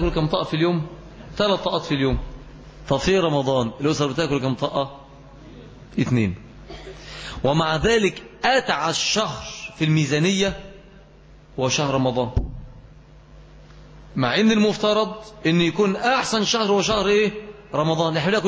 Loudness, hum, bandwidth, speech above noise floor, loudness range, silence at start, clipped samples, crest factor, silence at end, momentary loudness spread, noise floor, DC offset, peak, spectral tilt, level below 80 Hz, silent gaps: -21 LUFS; none; 8 kHz; 27 dB; 6 LU; 0 s; under 0.1%; 16 dB; 0 s; 17 LU; -47 dBFS; under 0.1%; -6 dBFS; -5 dB/octave; -40 dBFS; none